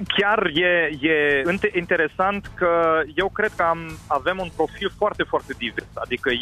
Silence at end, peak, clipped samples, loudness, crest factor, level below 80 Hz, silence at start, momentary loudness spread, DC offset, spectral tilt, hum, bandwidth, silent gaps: 0 s; -8 dBFS; under 0.1%; -22 LUFS; 14 dB; -48 dBFS; 0 s; 8 LU; under 0.1%; -5.5 dB/octave; none; 13.5 kHz; none